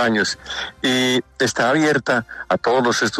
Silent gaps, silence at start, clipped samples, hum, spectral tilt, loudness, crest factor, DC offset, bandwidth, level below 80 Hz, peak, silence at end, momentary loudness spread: none; 0 s; under 0.1%; none; -3.5 dB/octave; -19 LUFS; 12 dB; under 0.1%; 13.5 kHz; -54 dBFS; -6 dBFS; 0 s; 6 LU